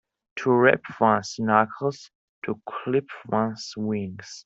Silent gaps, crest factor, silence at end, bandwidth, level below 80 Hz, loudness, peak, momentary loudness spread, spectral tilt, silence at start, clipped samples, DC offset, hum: 2.15-2.42 s; 22 dB; 0.05 s; 8 kHz; -66 dBFS; -24 LUFS; -4 dBFS; 14 LU; -6 dB/octave; 0.35 s; under 0.1%; under 0.1%; none